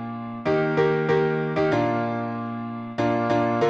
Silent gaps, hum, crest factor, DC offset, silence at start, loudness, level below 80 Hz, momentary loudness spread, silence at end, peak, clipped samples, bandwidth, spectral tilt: none; none; 14 dB; under 0.1%; 0 s; -24 LUFS; -58 dBFS; 9 LU; 0 s; -10 dBFS; under 0.1%; 7.4 kHz; -7.5 dB/octave